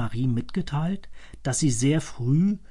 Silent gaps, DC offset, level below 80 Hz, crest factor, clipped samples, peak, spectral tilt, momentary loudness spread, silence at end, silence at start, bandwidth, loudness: none; under 0.1%; -46 dBFS; 14 dB; under 0.1%; -12 dBFS; -6 dB/octave; 8 LU; 0.05 s; 0 s; 11.5 kHz; -26 LUFS